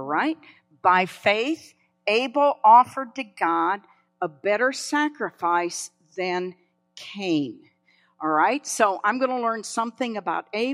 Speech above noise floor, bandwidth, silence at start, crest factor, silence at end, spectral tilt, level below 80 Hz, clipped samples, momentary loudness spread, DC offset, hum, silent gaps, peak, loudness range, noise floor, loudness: 41 dB; 13.5 kHz; 0 s; 20 dB; 0 s; -3.5 dB/octave; -78 dBFS; under 0.1%; 13 LU; under 0.1%; none; none; -4 dBFS; 6 LU; -64 dBFS; -23 LUFS